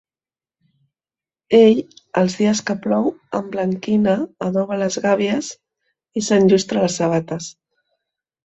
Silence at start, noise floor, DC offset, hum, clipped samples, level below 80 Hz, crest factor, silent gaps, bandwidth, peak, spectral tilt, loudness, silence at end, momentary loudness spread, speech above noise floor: 1.5 s; under -90 dBFS; under 0.1%; none; under 0.1%; -60 dBFS; 18 dB; none; 8.2 kHz; -2 dBFS; -5.5 dB/octave; -18 LUFS; 0.95 s; 12 LU; over 72 dB